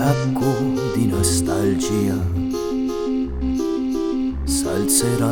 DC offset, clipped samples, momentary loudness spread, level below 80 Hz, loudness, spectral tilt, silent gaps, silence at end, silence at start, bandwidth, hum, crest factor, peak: under 0.1%; under 0.1%; 6 LU; -34 dBFS; -20 LUFS; -5 dB/octave; none; 0 s; 0 s; 19.5 kHz; none; 18 dB; -2 dBFS